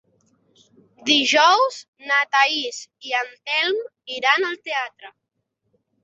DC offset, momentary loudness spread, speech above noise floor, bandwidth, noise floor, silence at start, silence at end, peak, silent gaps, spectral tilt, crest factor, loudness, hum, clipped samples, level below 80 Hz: under 0.1%; 15 LU; 54 dB; 8.4 kHz; -75 dBFS; 1.05 s; 0.95 s; -2 dBFS; 1.88-1.93 s; -0.5 dB/octave; 20 dB; -19 LUFS; none; under 0.1%; -74 dBFS